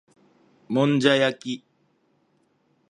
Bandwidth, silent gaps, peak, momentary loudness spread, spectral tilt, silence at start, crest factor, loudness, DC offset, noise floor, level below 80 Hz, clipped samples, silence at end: 10.5 kHz; none; -4 dBFS; 15 LU; -5.5 dB/octave; 0.7 s; 22 dB; -22 LUFS; under 0.1%; -67 dBFS; -74 dBFS; under 0.1%; 1.35 s